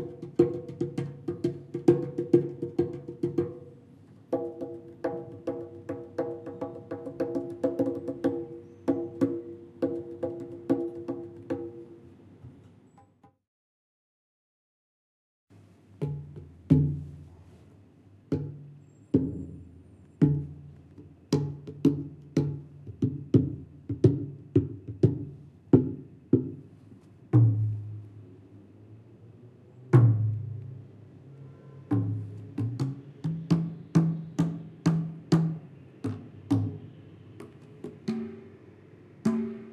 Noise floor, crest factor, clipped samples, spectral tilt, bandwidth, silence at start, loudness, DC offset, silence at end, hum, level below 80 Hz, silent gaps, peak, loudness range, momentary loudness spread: -60 dBFS; 24 dB; under 0.1%; -9.5 dB/octave; 9 kHz; 0 s; -30 LUFS; under 0.1%; 0 s; none; -58 dBFS; 13.47-15.47 s; -6 dBFS; 8 LU; 23 LU